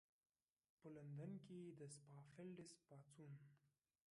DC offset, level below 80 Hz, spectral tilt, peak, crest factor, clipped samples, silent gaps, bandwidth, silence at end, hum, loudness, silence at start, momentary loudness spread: under 0.1%; under -90 dBFS; -6.5 dB/octave; -44 dBFS; 16 dB; under 0.1%; none; 11 kHz; 0.45 s; none; -60 LUFS; 0.8 s; 10 LU